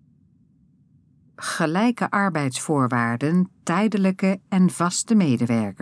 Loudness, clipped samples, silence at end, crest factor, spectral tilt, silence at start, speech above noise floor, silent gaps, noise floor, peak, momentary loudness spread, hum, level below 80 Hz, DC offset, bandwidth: -22 LUFS; under 0.1%; 0.05 s; 16 dB; -5.5 dB/octave; 1.4 s; 37 dB; none; -58 dBFS; -6 dBFS; 4 LU; none; -72 dBFS; under 0.1%; 11 kHz